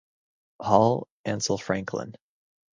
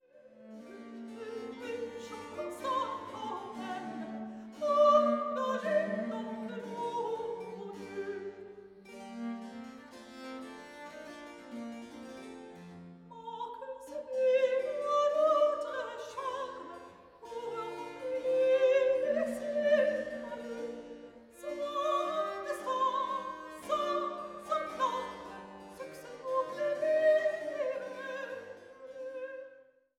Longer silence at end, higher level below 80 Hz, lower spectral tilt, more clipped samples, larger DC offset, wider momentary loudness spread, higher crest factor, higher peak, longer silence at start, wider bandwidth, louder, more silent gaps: first, 0.6 s vs 0.35 s; first, -60 dBFS vs -74 dBFS; about the same, -5 dB/octave vs -4.5 dB/octave; neither; neither; second, 14 LU vs 20 LU; about the same, 24 dB vs 20 dB; first, -4 dBFS vs -14 dBFS; first, 0.6 s vs 0.15 s; second, 10 kHz vs 13.5 kHz; first, -26 LUFS vs -33 LUFS; first, 1.10-1.24 s vs none